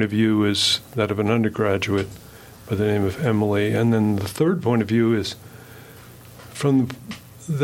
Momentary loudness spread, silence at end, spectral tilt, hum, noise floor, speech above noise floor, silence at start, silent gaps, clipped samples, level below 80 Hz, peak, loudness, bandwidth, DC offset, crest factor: 17 LU; 0 s; -5.5 dB/octave; none; -43 dBFS; 23 dB; 0 s; none; under 0.1%; -56 dBFS; -6 dBFS; -21 LUFS; 17 kHz; under 0.1%; 16 dB